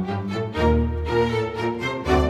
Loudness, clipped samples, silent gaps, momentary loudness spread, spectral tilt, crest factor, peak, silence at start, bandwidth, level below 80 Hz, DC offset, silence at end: -23 LUFS; under 0.1%; none; 6 LU; -7 dB/octave; 16 dB; -6 dBFS; 0 s; 12 kHz; -30 dBFS; under 0.1%; 0 s